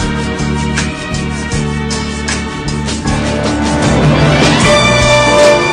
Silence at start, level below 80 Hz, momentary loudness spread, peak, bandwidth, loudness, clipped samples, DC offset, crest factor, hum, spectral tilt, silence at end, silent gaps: 0 s; -24 dBFS; 10 LU; 0 dBFS; 10.5 kHz; -11 LUFS; 0.3%; 0.3%; 12 dB; none; -4.5 dB/octave; 0 s; none